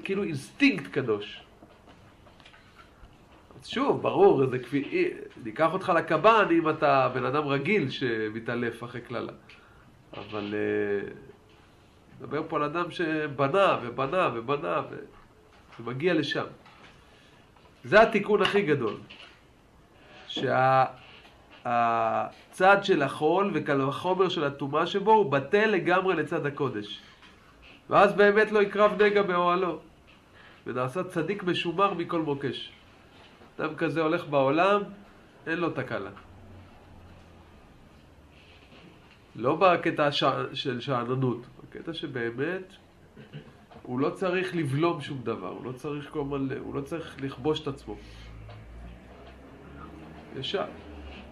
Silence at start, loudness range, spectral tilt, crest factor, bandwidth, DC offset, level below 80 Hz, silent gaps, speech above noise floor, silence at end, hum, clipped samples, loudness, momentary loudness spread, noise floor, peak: 0 s; 10 LU; -6.5 dB/octave; 22 dB; 12 kHz; under 0.1%; -58 dBFS; none; 31 dB; 0 s; none; under 0.1%; -26 LUFS; 21 LU; -57 dBFS; -6 dBFS